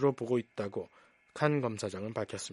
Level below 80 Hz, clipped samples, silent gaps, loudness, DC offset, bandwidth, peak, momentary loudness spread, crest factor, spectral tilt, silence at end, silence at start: -74 dBFS; under 0.1%; none; -34 LUFS; under 0.1%; 11.5 kHz; -12 dBFS; 12 LU; 22 dB; -6 dB/octave; 0 s; 0 s